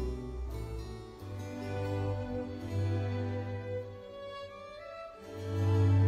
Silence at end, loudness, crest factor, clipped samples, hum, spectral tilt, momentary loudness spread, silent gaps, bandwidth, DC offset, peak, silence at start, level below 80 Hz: 0 s; -37 LUFS; 16 dB; under 0.1%; none; -8 dB/octave; 13 LU; none; 7.8 kHz; under 0.1%; -18 dBFS; 0 s; -48 dBFS